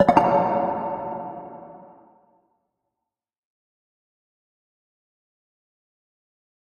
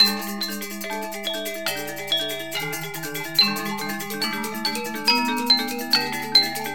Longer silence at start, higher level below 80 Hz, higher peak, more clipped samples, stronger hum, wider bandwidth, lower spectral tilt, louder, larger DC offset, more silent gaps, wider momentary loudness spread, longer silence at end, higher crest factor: about the same, 0 s vs 0 s; about the same, -58 dBFS vs -62 dBFS; first, 0 dBFS vs -4 dBFS; neither; neither; second, 10 kHz vs over 20 kHz; first, -7.5 dB/octave vs -2 dB/octave; about the same, -22 LUFS vs -22 LUFS; second, under 0.1% vs 0.8%; neither; first, 23 LU vs 11 LU; first, 4.9 s vs 0 s; first, 28 dB vs 20 dB